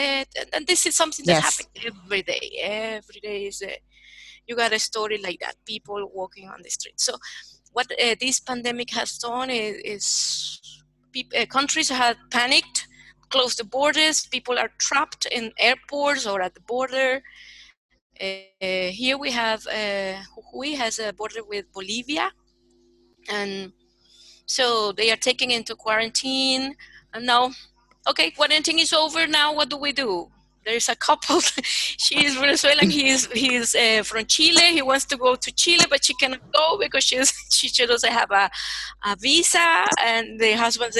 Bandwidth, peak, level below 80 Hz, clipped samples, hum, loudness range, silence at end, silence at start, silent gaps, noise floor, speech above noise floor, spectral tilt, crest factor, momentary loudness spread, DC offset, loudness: 13.5 kHz; 0 dBFS; -60 dBFS; under 0.1%; none; 11 LU; 0 s; 0 s; 17.77-17.89 s, 18.01-18.10 s; -61 dBFS; 38 dB; -1 dB/octave; 22 dB; 15 LU; under 0.1%; -21 LUFS